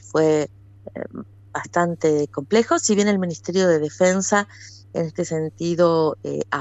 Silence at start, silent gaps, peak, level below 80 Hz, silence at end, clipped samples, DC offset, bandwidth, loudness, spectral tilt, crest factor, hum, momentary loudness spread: 0.05 s; none; -6 dBFS; -60 dBFS; 0 s; under 0.1%; under 0.1%; 8.4 kHz; -21 LUFS; -5 dB/octave; 16 dB; none; 16 LU